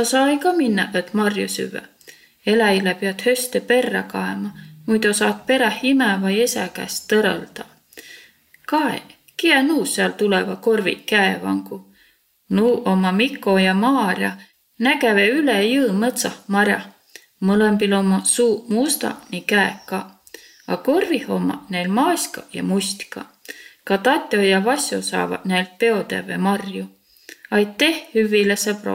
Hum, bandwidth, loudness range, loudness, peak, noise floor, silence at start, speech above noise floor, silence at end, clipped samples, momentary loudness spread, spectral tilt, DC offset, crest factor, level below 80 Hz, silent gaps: none; 16.5 kHz; 4 LU; -19 LUFS; -2 dBFS; -58 dBFS; 0 s; 39 dB; 0 s; under 0.1%; 13 LU; -4 dB/octave; under 0.1%; 18 dB; -64 dBFS; none